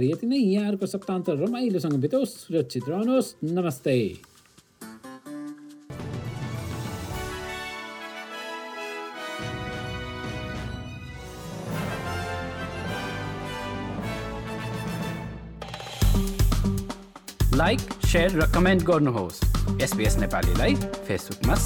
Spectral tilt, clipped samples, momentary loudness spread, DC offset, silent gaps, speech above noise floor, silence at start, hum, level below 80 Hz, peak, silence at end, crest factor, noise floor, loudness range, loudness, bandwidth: -5.5 dB/octave; under 0.1%; 16 LU; under 0.1%; none; 31 dB; 0 s; none; -34 dBFS; -12 dBFS; 0 s; 16 dB; -54 dBFS; 11 LU; -27 LUFS; 19.5 kHz